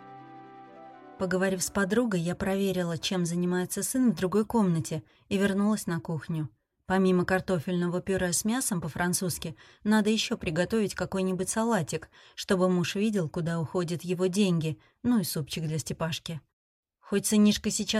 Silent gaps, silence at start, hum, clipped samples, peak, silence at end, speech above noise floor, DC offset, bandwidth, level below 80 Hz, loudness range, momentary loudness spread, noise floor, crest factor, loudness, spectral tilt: 16.53-16.83 s; 0 s; none; under 0.1%; -12 dBFS; 0 s; 21 dB; under 0.1%; 16 kHz; -56 dBFS; 2 LU; 10 LU; -49 dBFS; 16 dB; -28 LUFS; -5 dB/octave